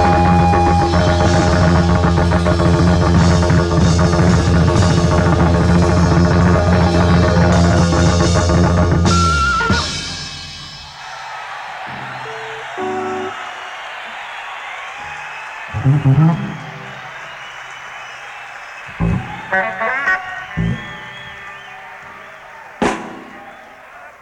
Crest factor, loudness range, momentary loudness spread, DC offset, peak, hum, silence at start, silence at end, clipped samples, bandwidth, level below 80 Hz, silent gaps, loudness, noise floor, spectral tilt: 14 dB; 13 LU; 18 LU; under 0.1%; -2 dBFS; none; 0 s; 0.1 s; under 0.1%; 10.5 kHz; -26 dBFS; none; -14 LUFS; -38 dBFS; -6 dB/octave